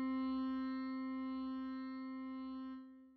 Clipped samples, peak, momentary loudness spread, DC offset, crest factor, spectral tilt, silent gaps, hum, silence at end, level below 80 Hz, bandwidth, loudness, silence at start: under 0.1%; -32 dBFS; 8 LU; under 0.1%; 10 dB; -3.5 dB/octave; none; none; 0 s; -74 dBFS; 4.6 kHz; -43 LUFS; 0 s